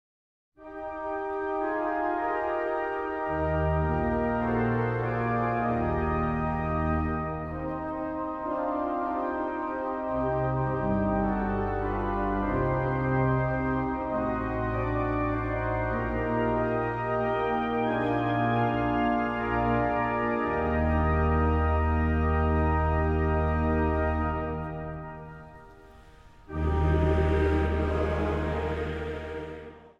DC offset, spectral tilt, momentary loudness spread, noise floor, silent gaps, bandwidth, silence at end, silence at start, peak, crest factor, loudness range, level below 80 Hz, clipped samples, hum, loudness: under 0.1%; -9.5 dB/octave; 8 LU; -51 dBFS; none; 5.4 kHz; 0.1 s; 0.6 s; -12 dBFS; 16 dB; 4 LU; -36 dBFS; under 0.1%; none; -28 LUFS